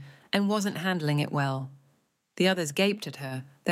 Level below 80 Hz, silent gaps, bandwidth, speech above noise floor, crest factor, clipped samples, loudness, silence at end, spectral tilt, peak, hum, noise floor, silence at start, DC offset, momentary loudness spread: -74 dBFS; none; 16 kHz; 41 dB; 20 dB; under 0.1%; -28 LUFS; 0 s; -5 dB/octave; -10 dBFS; none; -69 dBFS; 0 s; under 0.1%; 11 LU